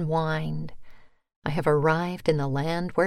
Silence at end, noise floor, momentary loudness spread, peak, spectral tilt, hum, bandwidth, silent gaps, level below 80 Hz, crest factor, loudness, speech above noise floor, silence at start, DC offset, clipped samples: 0 s; -45 dBFS; 12 LU; -8 dBFS; -7.5 dB/octave; none; 13.5 kHz; 1.36-1.42 s; -48 dBFS; 18 dB; -26 LUFS; 20 dB; 0 s; under 0.1%; under 0.1%